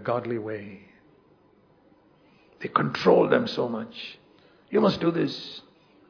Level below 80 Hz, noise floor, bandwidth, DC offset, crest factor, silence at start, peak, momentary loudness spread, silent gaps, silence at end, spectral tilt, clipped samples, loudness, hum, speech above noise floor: -66 dBFS; -60 dBFS; 5.4 kHz; under 0.1%; 22 dB; 0 s; -6 dBFS; 19 LU; none; 0.5 s; -7 dB/octave; under 0.1%; -25 LUFS; none; 35 dB